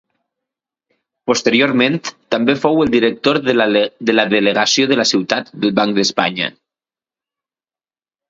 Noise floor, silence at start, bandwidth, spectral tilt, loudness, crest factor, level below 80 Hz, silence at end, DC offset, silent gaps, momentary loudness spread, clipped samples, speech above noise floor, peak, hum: under -90 dBFS; 1.25 s; 7.8 kHz; -4 dB/octave; -15 LUFS; 16 dB; -56 dBFS; 1.8 s; under 0.1%; none; 7 LU; under 0.1%; over 75 dB; 0 dBFS; none